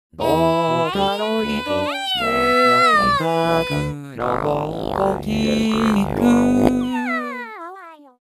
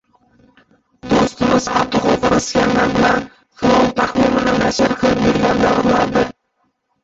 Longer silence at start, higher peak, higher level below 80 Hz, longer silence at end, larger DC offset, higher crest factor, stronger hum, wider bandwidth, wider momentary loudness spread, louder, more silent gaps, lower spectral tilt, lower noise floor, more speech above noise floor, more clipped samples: second, 0.2 s vs 1.05 s; about the same, 0 dBFS vs -2 dBFS; about the same, -42 dBFS vs -38 dBFS; second, 0.25 s vs 0.75 s; neither; about the same, 18 dB vs 14 dB; neither; first, 15.5 kHz vs 8 kHz; first, 10 LU vs 5 LU; second, -18 LUFS vs -15 LUFS; neither; about the same, -5.5 dB/octave vs -5 dB/octave; second, -40 dBFS vs -66 dBFS; second, 21 dB vs 51 dB; neither